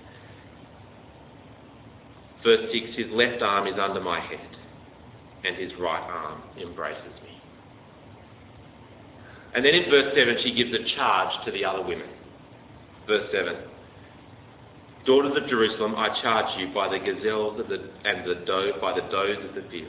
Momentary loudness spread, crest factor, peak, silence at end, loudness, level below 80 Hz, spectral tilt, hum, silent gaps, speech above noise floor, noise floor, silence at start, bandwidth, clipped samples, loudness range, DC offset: 17 LU; 22 dB; -4 dBFS; 0 s; -25 LUFS; -58 dBFS; -8 dB/octave; none; none; 24 dB; -49 dBFS; 0 s; 4 kHz; under 0.1%; 11 LU; under 0.1%